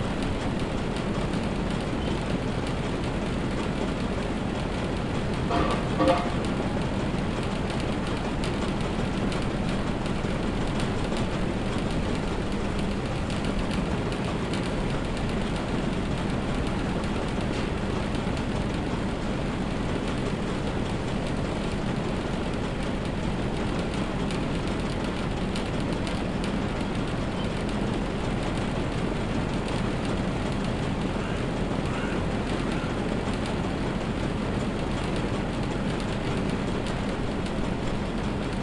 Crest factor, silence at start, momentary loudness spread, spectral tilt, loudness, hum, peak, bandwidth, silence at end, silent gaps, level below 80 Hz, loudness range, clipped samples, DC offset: 18 dB; 0 s; 1 LU; -6.5 dB/octave; -29 LUFS; none; -10 dBFS; 11.5 kHz; 0 s; none; -36 dBFS; 2 LU; under 0.1%; 0.2%